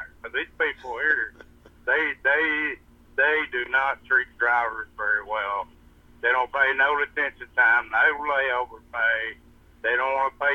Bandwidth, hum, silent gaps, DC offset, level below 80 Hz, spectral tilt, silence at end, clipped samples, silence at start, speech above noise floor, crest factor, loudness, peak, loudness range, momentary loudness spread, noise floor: 6.6 kHz; none; none; under 0.1%; -56 dBFS; -4 dB/octave; 0 s; under 0.1%; 0 s; 28 dB; 16 dB; -24 LUFS; -8 dBFS; 2 LU; 10 LU; -53 dBFS